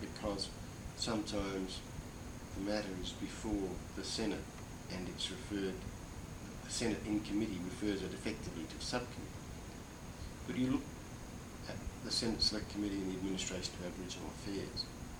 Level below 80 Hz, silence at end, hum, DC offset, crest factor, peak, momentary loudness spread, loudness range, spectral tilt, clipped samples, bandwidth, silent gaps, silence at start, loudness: -54 dBFS; 0 s; none; under 0.1%; 20 dB; -22 dBFS; 12 LU; 4 LU; -4 dB/octave; under 0.1%; over 20 kHz; none; 0 s; -41 LUFS